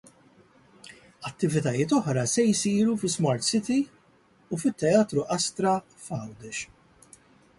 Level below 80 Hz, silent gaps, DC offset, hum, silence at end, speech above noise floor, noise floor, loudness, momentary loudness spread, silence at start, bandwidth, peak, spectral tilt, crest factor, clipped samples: -64 dBFS; none; under 0.1%; none; 0.95 s; 35 dB; -61 dBFS; -26 LUFS; 13 LU; 0.9 s; 11.5 kHz; -8 dBFS; -5 dB/octave; 18 dB; under 0.1%